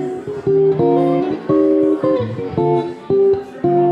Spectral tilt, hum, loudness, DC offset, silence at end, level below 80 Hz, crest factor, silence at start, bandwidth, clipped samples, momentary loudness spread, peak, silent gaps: -9.5 dB/octave; none; -16 LUFS; under 0.1%; 0 s; -52 dBFS; 12 dB; 0 s; 5.4 kHz; under 0.1%; 6 LU; -4 dBFS; none